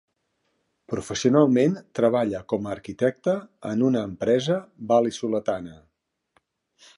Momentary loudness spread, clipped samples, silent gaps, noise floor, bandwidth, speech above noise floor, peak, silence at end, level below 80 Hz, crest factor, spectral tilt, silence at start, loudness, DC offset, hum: 11 LU; under 0.1%; none; -75 dBFS; 11.5 kHz; 52 dB; -4 dBFS; 1.25 s; -60 dBFS; 20 dB; -6 dB/octave; 0.9 s; -24 LUFS; under 0.1%; none